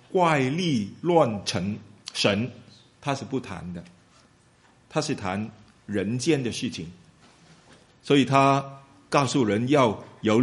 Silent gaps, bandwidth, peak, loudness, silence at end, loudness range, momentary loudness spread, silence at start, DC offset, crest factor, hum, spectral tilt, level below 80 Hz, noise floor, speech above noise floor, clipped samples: none; 11.5 kHz; -4 dBFS; -25 LUFS; 0 s; 8 LU; 16 LU; 0.15 s; under 0.1%; 22 dB; none; -5.5 dB/octave; -62 dBFS; -59 dBFS; 35 dB; under 0.1%